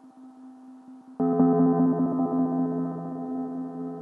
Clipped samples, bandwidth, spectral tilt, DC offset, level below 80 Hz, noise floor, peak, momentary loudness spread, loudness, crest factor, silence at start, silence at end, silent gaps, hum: under 0.1%; 1.9 kHz; -12.5 dB/octave; under 0.1%; -74 dBFS; -47 dBFS; -10 dBFS; 13 LU; -25 LUFS; 18 dB; 0.05 s; 0 s; none; none